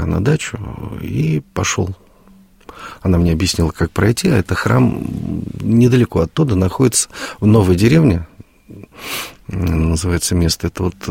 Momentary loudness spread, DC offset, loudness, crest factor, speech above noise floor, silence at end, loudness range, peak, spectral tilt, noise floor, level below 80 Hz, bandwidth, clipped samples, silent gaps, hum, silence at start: 13 LU; under 0.1%; -16 LUFS; 14 dB; 31 dB; 0 s; 5 LU; -2 dBFS; -5.5 dB/octave; -46 dBFS; -32 dBFS; 16.5 kHz; under 0.1%; none; none; 0 s